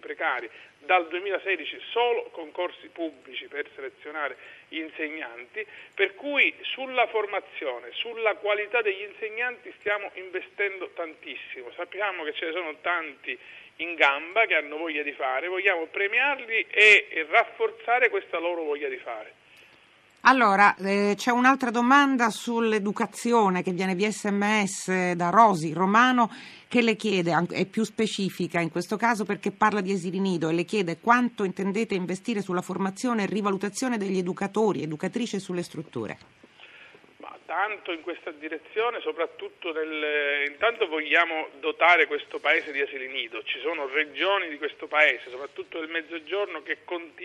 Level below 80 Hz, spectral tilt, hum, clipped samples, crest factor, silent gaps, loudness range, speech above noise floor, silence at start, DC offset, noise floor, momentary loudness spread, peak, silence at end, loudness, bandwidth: -76 dBFS; -4.5 dB/octave; none; under 0.1%; 22 dB; none; 10 LU; 31 dB; 0.05 s; under 0.1%; -58 dBFS; 15 LU; -4 dBFS; 0 s; -25 LUFS; 13 kHz